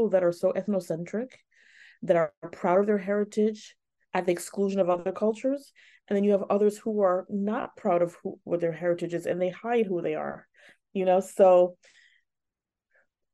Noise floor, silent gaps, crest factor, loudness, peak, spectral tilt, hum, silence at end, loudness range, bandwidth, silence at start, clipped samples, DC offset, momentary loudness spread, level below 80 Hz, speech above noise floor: -88 dBFS; 2.37-2.42 s; 18 dB; -27 LUFS; -8 dBFS; -6.5 dB/octave; none; 1.6 s; 3 LU; 12.5 kHz; 0 s; under 0.1%; under 0.1%; 10 LU; -76 dBFS; 62 dB